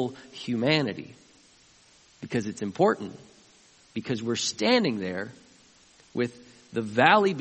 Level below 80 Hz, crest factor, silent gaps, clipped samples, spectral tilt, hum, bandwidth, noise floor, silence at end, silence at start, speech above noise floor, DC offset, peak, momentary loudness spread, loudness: -68 dBFS; 24 dB; none; under 0.1%; -4.5 dB/octave; none; 8.4 kHz; -58 dBFS; 0 s; 0 s; 32 dB; under 0.1%; -4 dBFS; 18 LU; -26 LUFS